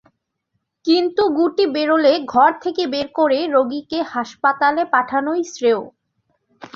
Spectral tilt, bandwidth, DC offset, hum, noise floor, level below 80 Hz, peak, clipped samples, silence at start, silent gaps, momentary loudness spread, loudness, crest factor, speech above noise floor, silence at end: -4 dB/octave; 7.6 kHz; under 0.1%; none; -73 dBFS; -62 dBFS; -2 dBFS; under 0.1%; 0.85 s; none; 7 LU; -18 LUFS; 16 dB; 56 dB; 0.1 s